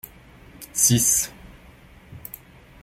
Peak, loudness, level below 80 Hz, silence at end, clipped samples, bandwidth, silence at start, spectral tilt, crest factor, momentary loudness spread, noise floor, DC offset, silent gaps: -4 dBFS; -19 LUFS; -50 dBFS; 0.65 s; under 0.1%; 16.5 kHz; 0.6 s; -3 dB/octave; 22 dB; 26 LU; -48 dBFS; under 0.1%; none